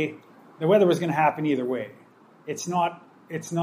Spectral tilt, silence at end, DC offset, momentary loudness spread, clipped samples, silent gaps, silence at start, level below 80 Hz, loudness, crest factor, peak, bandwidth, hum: -6 dB/octave; 0 s; under 0.1%; 16 LU; under 0.1%; none; 0 s; -76 dBFS; -24 LUFS; 18 dB; -6 dBFS; 15.5 kHz; none